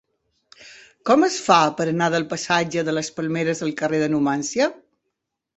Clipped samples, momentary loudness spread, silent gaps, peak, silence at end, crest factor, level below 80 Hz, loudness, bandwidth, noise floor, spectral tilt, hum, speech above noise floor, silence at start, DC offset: under 0.1%; 8 LU; none; -2 dBFS; 0.8 s; 20 dB; -64 dBFS; -21 LUFS; 8.2 kHz; -79 dBFS; -4.5 dB/octave; none; 59 dB; 0.6 s; under 0.1%